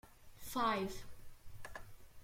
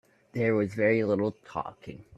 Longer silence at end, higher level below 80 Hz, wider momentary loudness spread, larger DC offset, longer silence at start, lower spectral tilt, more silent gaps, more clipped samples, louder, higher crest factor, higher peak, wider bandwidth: second, 0 s vs 0.15 s; first, -58 dBFS vs -64 dBFS; first, 25 LU vs 15 LU; neither; second, 0.05 s vs 0.35 s; second, -4 dB/octave vs -8.5 dB/octave; neither; neither; second, -39 LUFS vs -28 LUFS; about the same, 20 dB vs 18 dB; second, -24 dBFS vs -12 dBFS; first, 16.5 kHz vs 9.8 kHz